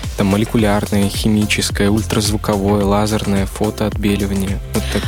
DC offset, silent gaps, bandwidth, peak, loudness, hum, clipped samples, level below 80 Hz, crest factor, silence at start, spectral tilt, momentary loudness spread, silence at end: under 0.1%; none; 17.5 kHz; -2 dBFS; -16 LUFS; none; under 0.1%; -28 dBFS; 14 dB; 0 s; -5.5 dB/octave; 5 LU; 0 s